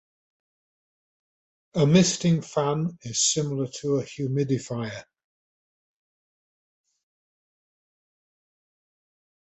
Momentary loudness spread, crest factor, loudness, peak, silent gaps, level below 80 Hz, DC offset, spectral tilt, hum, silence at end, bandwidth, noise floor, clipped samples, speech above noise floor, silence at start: 13 LU; 22 dB; -24 LUFS; -6 dBFS; none; -64 dBFS; under 0.1%; -5 dB/octave; none; 4.45 s; 8.4 kHz; under -90 dBFS; under 0.1%; over 66 dB; 1.75 s